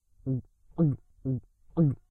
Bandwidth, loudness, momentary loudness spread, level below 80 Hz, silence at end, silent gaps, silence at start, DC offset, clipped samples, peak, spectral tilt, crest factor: 1.8 kHz; -31 LUFS; 9 LU; -54 dBFS; 0.15 s; none; 0.25 s; under 0.1%; under 0.1%; -14 dBFS; -13.5 dB/octave; 16 dB